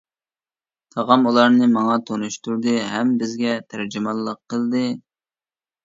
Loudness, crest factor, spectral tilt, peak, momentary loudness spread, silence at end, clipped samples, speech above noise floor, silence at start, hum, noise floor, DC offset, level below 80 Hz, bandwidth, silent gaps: -20 LUFS; 20 dB; -5 dB/octave; 0 dBFS; 12 LU; 0.85 s; under 0.1%; over 71 dB; 0.95 s; none; under -90 dBFS; under 0.1%; -68 dBFS; 7.8 kHz; none